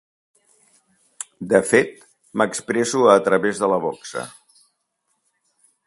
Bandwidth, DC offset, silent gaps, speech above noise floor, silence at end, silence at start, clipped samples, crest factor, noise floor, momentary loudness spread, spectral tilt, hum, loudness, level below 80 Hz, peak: 11.5 kHz; under 0.1%; none; 54 dB; 1.55 s; 1.2 s; under 0.1%; 22 dB; -72 dBFS; 18 LU; -4 dB/octave; none; -19 LUFS; -64 dBFS; 0 dBFS